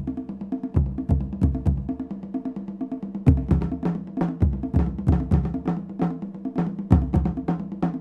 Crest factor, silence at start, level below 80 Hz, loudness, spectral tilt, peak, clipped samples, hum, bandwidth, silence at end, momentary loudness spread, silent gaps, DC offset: 22 dB; 0 s; -30 dBFS; -25 LUFS; -11 dB/octave; -2 dBFS; under 0.1%; none; 4.3 kHz; 0 s; 10 LU; none; under 0.1%